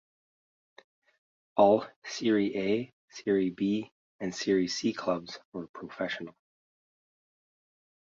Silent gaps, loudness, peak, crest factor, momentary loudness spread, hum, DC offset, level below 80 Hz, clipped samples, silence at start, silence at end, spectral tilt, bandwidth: 1.96-2.02 s, 2.93-3.08 s, 3.91-4.19 s, 5.45-5.52 s, 5.69-5.74 s; -30 LUFS; -8 dBFS; 24 dB; 17 LU; none; under 0.1%; -70 dBFS; under 0.1%; 1.55 s; 1.7 s; -5 dB/octave; 7.6 kHz